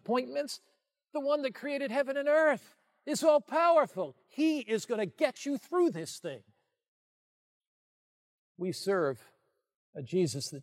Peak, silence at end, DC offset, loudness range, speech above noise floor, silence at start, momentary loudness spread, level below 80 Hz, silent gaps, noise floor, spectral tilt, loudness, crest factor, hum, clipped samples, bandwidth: -12 dBFS; 0 s; under 0.1%; 10 LU; over 59 dB; 0.1 s; 15 LU; -88 dBFS; 6.88-7.61 s, 7.67-8.55 s, 9.76-9.93 s; under -90 dBFS; -5 dB/octave; -31 LUFS; 20 dB; none; under 0.1%; 16 kHz